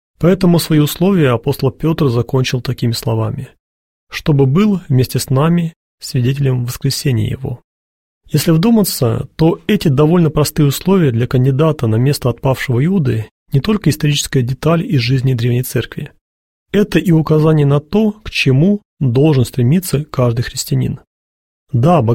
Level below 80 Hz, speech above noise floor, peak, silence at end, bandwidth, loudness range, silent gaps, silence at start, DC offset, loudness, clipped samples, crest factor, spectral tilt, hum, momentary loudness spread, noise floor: -38 dBFS; over 77 dB; -2 dBFS; 0 s; 16.5 kHz; 3 LU; 3.60-4.07 s, 5.76-5.98 s, 7.64-8.21 s, 13.31-13.46 s, 16.21-16.66 s, 18.85-18.97 s, 21.07-21.66 s; 0.2 s; 0.4%; -14 LUFS; under 0.1%; 12 dB; -6.5 dB/octave; none; 8 LU; under -90 dBFS